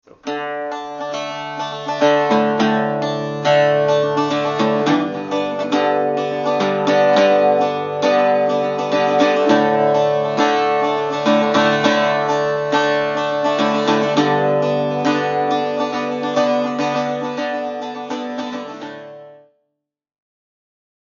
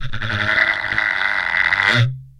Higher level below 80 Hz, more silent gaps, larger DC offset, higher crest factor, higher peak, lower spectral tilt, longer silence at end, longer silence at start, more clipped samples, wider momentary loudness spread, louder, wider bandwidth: second, -64 dBFS vs -38 dBFS; neither; neither; about the same, 16 dB vs 18 dB; about the same, 0 dBFS vs -2 dBFS; about the same, -3.5 dB/octave vs -4.5 dB/octave; first, 1.7 s vs 0.1 s; first, 0.25 s vs 0 s; neither; first, 11 LU vs 4 LU; about the same, -17 LUFS vs -16 LUFS; second, 7.4 kHz vs 11 kHz